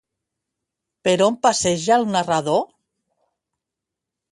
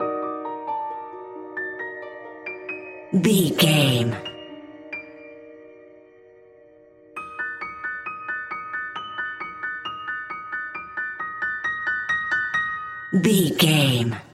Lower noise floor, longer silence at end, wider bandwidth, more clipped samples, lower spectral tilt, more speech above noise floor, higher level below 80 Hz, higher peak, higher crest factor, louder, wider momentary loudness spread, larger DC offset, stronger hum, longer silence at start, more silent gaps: first, -85 dBFS vs -51 dBFS; first, 1.65 s vs 0.05 s; second, 11.5 kHz vs 16 kHz; neither; about the same, -4 dB/octave vs -4.5 dB/octave; first, 66 dB vs 32 dB; about the same, -60 dBFS vs -62 dBFS; about the same, -2 dBFS vs -4 dBFS; about the same, 20 dB vs 22 dB; first, -19 LUFS vs -24 LUFS; second, 6 LU vs 19 LU; neither; neither; first, 1.05 s vs 0 s; neither